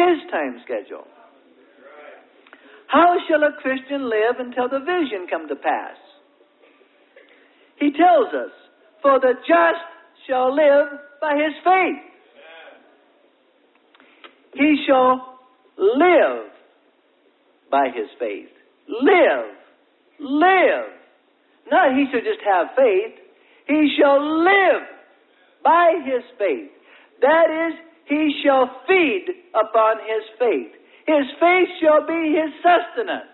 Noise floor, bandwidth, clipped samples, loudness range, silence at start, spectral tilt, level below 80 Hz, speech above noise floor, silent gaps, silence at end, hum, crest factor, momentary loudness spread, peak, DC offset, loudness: -60 dBFS; 4.3 kHz; under 0.1%; 6 LU; 0 s; -8 dB/octave; -70 dBFS; 42 dB; none; 0.1 s; none; 16 dB; 14 LU; -2 dBFS; under 0.1%; -18 LUFS